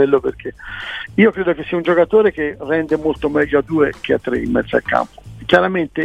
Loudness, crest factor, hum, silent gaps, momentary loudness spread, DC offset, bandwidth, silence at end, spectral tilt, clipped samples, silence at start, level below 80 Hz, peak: -17 LUFS; 16 dB; none; none; 12 LU; 0.1%; 9.2 kHz; 0 s; -7 dB/octave; under 0.1%; 0 s; -42 dBFS; 0 dBFS